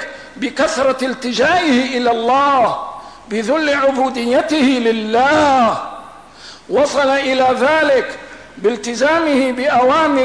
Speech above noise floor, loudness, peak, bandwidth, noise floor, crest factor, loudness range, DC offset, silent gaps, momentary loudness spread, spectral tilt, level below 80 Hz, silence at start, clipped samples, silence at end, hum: 24 dB; -15 LUFS; -6 dBFS; 11 kHz; -38 dBFS; 10 dB; 1 LU; 0.3%; none; 12 LU; -3.5 dB/octave; -50 dBFS; 0 s; under 0.1%; 0 s; none